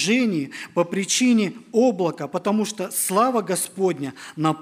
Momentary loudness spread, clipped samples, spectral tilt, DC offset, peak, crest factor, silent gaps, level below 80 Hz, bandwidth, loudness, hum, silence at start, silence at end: 7 LU; under 0.1%; -4 dB/octave; under 0.1%; -6 dBFS; 16 dB; none; -74 dBFS; 16 kHz; -22 LUFS; none; 0 s; 0 s